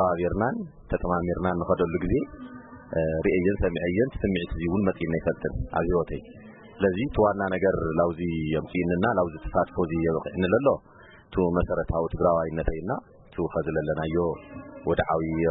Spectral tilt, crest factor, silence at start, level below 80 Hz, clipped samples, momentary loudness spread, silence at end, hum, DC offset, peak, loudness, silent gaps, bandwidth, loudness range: -12 dB/octave; 18 dB; 0 s; -40 dBFS; under 0.1%; 9 LU; 0 s; none; under 0.1%; -8 dBFS; -26 LUFS; none; 4 kHz; 2 LU